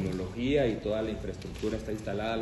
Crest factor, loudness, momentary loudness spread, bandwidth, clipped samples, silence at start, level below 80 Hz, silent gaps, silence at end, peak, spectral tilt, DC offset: 16 dB; -32 LUFS; 8 LU; 12 kHz; under 0.1%; 0 s; -46 dBFS; none; 0 s; -16 dBFS; -6.5 dB/octave; under 0.1%